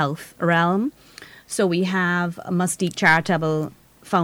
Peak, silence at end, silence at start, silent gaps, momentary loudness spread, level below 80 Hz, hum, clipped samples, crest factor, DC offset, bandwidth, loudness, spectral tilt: -6 dBFS; 0 s; 0 s; none; 9 LU; -60 dBFS; none; under 0.1%; 16 dB; under 0.1%; 16.5 kHz; -21 LUFS; -5 dB/octave